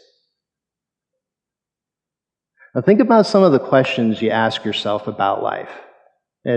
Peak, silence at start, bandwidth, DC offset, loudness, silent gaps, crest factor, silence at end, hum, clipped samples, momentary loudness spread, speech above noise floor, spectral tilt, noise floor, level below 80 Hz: -2 dBFS; 2.75 s; 9.4 kHz; under 0.1%; -16 LUFS; none; 18 dB; 0 s; none; under 0.1%; 14 LU; 71 dB; -6.5 dB/octave; -87 dBFS; -68 dBFS